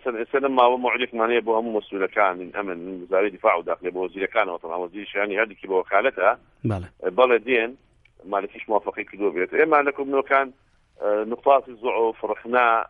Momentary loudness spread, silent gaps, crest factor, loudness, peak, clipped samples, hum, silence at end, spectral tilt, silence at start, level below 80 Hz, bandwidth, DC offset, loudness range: 11 LU; none; 20 dB; -23 LUFS; -4 dBFS; under 0.1%; none; 0.05 s; -7.5 dB/octave; 0.05 s; -60 dBFS; 4.6 kHz; under 0.1%; 2 LU